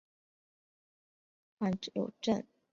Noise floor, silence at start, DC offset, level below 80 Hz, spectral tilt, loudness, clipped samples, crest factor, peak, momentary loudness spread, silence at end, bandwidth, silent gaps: under -90 dBFS; 1.6 s; under 0.1%; -74 dBFS; -5.5 dB/octave; -36 LUFS; under 0.1%; 22 dB; -18 dBFS; 3 LU; 0.3 s; 7.6 kHz; none